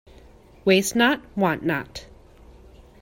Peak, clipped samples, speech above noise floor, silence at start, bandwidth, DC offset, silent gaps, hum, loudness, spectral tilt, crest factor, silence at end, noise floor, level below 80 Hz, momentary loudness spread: -6 dBFS; under 0.1%; 28 dB; 0.65 s; 16.5 kHz; under 0.1%; none; none; -22 LUFS; -4 dB/octave; 20 dB; 1 s; -49 dBFS; -50 dBFS; 14 LU